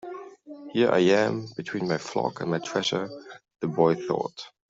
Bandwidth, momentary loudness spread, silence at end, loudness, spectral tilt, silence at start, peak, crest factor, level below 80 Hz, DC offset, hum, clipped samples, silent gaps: 7.8 kHz; 19 LU; 0.2 s; -26 LUFS; -5.5 dB/octave; 0.05 s; -8 dBFS; 20 dB; -68 dBFS; under 0.1%; none; under 0.1%; none